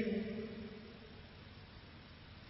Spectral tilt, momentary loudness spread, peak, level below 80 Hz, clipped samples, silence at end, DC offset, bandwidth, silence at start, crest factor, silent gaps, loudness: -5.5 dB/octave; 15 LU; -26 dBFS; -62 dBFS; under 0.1%; 0 s; under 0.1%; 5.6 kHz; 0 s; 20 dB; none; -48 LUFS